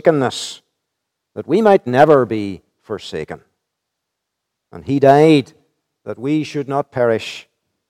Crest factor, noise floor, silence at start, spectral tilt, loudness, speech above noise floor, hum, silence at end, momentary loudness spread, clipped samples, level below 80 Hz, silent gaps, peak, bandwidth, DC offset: 18 dB; -78 dBFS; 0.05 s; -6.5 dB/octave; -15 LUFS; 63 dB; none; 0.5 s; 23 LU; under 0.1%; -60 dBFS; none; 0 dBFS; 13.5 kHz; under 0.1%